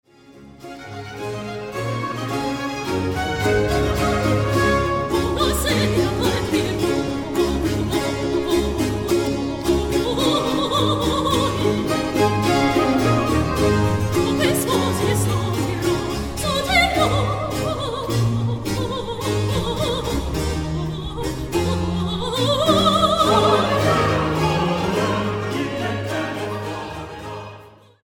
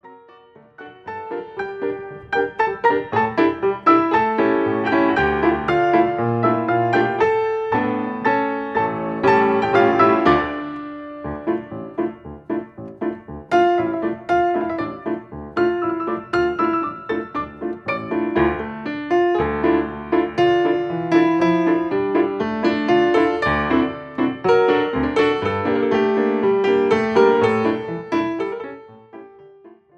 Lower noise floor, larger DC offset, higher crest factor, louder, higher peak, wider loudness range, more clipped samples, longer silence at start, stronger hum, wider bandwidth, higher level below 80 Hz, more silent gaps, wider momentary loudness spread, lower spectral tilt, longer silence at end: about the same, -45 dBFS vs -48 dBFS; neither; about the same, 16 dB vs 18 dB; about the same, -20 LUFS vs -19 LUFS; about the same, -4 dBFS vs -2 dBFS; about the same, 5 LU vs 5 LU; neither; first, 0.3 s vs 0.05 s; neither; first, 17.5 kHz vs 7.6 kHz; first, -34 dBFS vs -46 dBFS; neither; about the same, 10 LU vs 12 LU; second, -5 dB/octave vs -7 dB/octave; about the same, 0.35 s vs 0.3 s